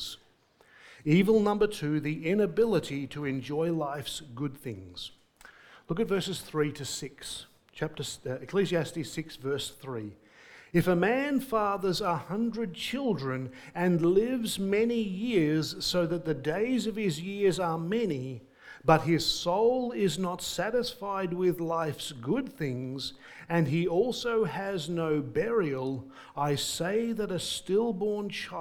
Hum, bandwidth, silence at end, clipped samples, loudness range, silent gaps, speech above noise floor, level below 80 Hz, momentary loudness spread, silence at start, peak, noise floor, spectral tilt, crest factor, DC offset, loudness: none; 19 kHz; 0 s; under 0.1%; 6 LU; none; 34 dB; -58 dBFS; 12 LU; 0 s; -8 dBFS; -63 dBFS; -5.5 dB/octave; 22 dB; under 0.1%; -30 LUFS